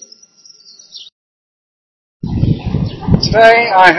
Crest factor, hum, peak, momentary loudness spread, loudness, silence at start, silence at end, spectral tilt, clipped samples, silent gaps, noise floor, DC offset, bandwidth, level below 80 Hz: 14 dB; none; 0 dBFS; 26 LU; -11 LUFS; 0.95 s; 0 s; -6 dB/octave; 0.5%; 1.12-2.20 s; -44 dBFS; under 0.1%; 11 kHz; -30 dBFS